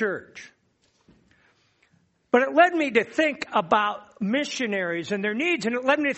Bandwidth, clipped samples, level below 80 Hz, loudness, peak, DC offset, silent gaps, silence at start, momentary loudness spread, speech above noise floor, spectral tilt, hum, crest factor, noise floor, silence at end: 8.2 kHz; under 0.1%; -70 dBFS; -23 LUFS; -4 dBFS; under 0.1%; none; 0 s; 9 LU; 43 dB; -4.5 dB/octave; none; 20 dB; -67 dBFS; 0 s